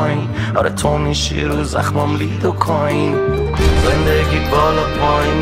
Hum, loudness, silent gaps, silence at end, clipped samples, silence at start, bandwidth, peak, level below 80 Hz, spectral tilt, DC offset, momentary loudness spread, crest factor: none; -16 LUFS; none; 0 s; under 0.1%; 0 s; 15.5 kHz; 0 dBFS; -24 dBFS; -5.5 dB/octave; under 0.1%; 4 LU; 16 dB